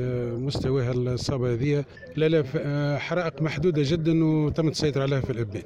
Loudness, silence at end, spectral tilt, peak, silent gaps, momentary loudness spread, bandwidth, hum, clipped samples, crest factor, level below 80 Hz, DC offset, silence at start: -25 LUFS; 0 s; -7 dB/octave; -12 dBFS; none; 6 LU; 10.5 kHz; none; under 0.1%; 14 dB; -46 dBFS; under 0.1%; 0 s